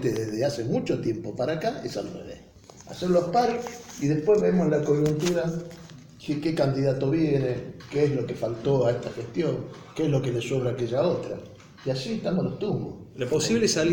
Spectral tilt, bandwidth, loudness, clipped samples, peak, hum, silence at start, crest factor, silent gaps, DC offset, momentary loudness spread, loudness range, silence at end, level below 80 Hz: -6 dB/octave; 17 kHz; -26 LUFS; under 0.1%; -10 dBFS; none; 0 s; 16 dB; none; under 0.1%; 14 LU; 4 LU; 0 s; -54 dBFS